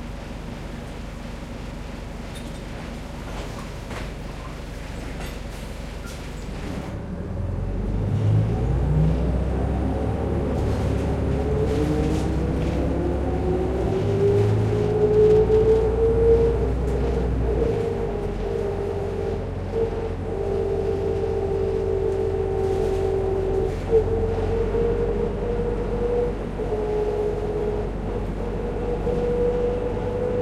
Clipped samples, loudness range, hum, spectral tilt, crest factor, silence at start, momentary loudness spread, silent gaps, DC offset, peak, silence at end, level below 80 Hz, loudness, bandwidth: under 0.1%; 14 LU; none; -8 dB/octave; 16 dB; 0 s; 15 LU; none; under 0.1%; -6 dBFS; 0 s; -30 dBFS; -24 LUFS; 13 kHz